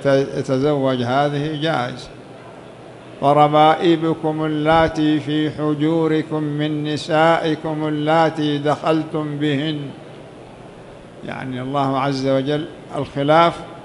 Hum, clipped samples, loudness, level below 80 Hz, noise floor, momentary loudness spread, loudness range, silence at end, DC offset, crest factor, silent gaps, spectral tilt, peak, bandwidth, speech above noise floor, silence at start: none; under 0.1%; -18 LUFS; -50 dBFS; -39 dBFS; 24 LU; 7 LU; 0 s; under 0.1%; 18 dB; none; -7 dB/octave; -2 dBFS; 11.5 kHz; 21 dB; 0 s